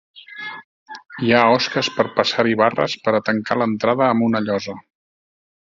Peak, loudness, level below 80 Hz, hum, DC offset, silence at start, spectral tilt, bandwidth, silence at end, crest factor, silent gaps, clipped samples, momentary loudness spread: 0 dBFS; -18 LUFS; -60 dBFS; none; under 0.1%; 0.15 s; -5 dB/octave; 7.6 kHz; 0.85 s; 20 dB; 0.64-0.86 s; under 0.1%; 21 LU